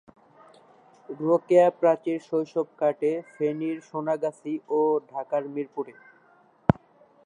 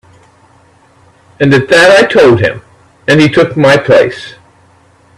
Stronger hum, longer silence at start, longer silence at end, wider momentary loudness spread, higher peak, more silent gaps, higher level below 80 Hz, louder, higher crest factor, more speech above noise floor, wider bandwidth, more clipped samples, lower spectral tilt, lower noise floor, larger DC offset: neither; second, 1.1 s vs 1.4 s; second, 0.55 s vs 0.85 s; second, 13 LU vs 16 LU; about the same, 0 dBFS vs 0 dBFS; neither; second, -56 dBFS vs -44 dBFS; second, -26 LUFS vs -7 LUFS; first, 26 dB vs 10 dB; second, 34 dB vs 38 dB; second, 10 kHz vs 13.5 kHz; second, under 0.1% vs 0.2%; first, -8.5 dB/octave vs -5.5 dB/octave; first, -59 dBFS vs -45 dBFS; neither